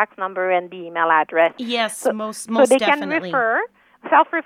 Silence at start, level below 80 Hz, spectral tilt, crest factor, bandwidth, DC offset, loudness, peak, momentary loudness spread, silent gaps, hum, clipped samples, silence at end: 0 s; -74 dBFS; -3 dB/octave; 18 dB; 15.5 kHz; under 0.1%; -19 LUFS; -2 dBFS; 8 LU; none; none; under 0.1%; 0.05 s